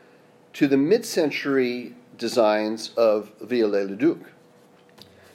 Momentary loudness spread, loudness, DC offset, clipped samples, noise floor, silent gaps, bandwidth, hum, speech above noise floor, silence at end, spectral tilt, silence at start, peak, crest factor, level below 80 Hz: 12 LU; -23 LUFS; under 0.1%; under 0.1%; -54 dBFS; none; 16 kHz; none; 32 dB; 1.15 s; -5 dB/octave; 0.55 s; -6 dBFS; 18 dB; -80 dBFS